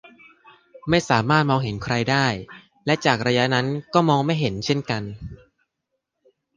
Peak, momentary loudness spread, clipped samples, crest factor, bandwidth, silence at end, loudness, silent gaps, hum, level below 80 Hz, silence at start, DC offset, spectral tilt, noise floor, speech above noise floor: -2 dBFS; 14 LU; under 0.1%; 20 dB; 9.8 kHz; 1.2 s; -21 LUFS; none; none; -50 dBFS; 0.05 s; under 0.1%; -5.5 dB/octave; -79 dBFS; 58 dB